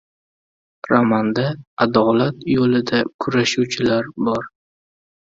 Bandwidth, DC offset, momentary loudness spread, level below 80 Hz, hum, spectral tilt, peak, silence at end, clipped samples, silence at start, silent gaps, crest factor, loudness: 7.8 kHz; under 0.1%; 7 LU; -54 dBFS; none; -5.5 dB/octave; 0 dBFS; 0.75 s; under 0.1%; 0.85 s; 1.67-1.77 s, 3.14-3.19 s; 18 dB; -18 LUFS